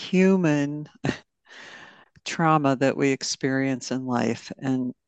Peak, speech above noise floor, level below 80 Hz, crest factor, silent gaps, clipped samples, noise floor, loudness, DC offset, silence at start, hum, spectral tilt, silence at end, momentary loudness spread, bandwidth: -6 dBFS; 26 dB; -68 dBFS; 18 dB; none; under 0.1%; -50 dBFS; -24 LUFS; under 0.1%; 0 s; none; -5.5 dB/octave; 0.15 s; 18 LU; 8.8 kHz